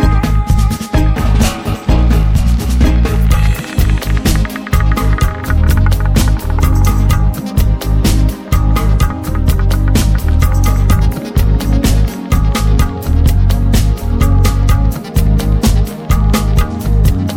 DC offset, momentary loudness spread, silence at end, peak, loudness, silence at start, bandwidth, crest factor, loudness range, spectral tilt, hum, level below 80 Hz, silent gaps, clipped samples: under 0.1%; 3 LU; 0 s; 0 dBFS; -13 LUFS; 0 s; 16.5 kHz; 10 dB; 1 LU; -6 dB/octave; none; -12 dBFS; none; under 0.1%